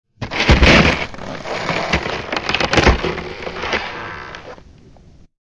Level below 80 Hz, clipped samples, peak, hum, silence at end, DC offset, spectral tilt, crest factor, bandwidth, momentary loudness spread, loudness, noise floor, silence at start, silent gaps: -26 dBFS; under 0.1%; 0 dBFS; none; 0.75 s; under 0.1%; -5 dB/octave; 18 dB; 10.5 kHz; 19 LU; -16 LUFS; -45 dBFS; 0.2 s; none